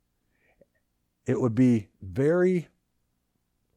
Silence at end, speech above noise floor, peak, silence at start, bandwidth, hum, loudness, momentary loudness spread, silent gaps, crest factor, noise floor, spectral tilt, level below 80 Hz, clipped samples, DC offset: 1.15 s; 51 dB; -12 dBFS; 1.25 s; 9.8 kHz; 60 Hz at -45 dBFS; -25 LUFS; 10 LU; none; 16 dB; -75 dBFS; -9 dB/octave; -62 dBFS; under 0.1%; under 0.1%